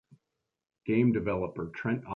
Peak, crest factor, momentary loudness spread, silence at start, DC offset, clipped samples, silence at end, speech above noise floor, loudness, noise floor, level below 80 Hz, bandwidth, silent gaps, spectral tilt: -14 dBFS; 18 dB; 10 LU; 0.85 s; under 0.1%; under 0.1%; 0 s; 56 dB; -30 LUFS; -85 dBFS; -58 dBFS; 4.2 kHz; none; -10 dB/octave